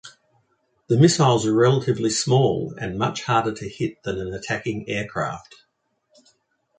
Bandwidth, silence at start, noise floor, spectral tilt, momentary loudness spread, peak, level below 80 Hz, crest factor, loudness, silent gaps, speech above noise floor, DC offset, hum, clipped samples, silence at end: 9.4 kHz; 0.05 s; -69 dBFS; -5.5 dB/octave; 12 LU; -2 dBFS; -54 dBFS; 20 dB; -22 LUFS; none; 48 dB; under 0.1%; none; under 0.1%; 1.4 s